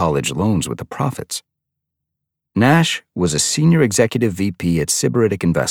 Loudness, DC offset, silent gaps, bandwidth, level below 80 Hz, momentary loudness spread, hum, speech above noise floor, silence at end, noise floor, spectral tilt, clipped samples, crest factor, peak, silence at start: -17 LUFS; under 0.1%; none; 17 kHz; -44 dBFS; 10 LU; none; 63 dB; 0 s; -80 dBFS; -4.5 dB/octave; under 0.1%; 16 dB; -2 dBFS; 0 s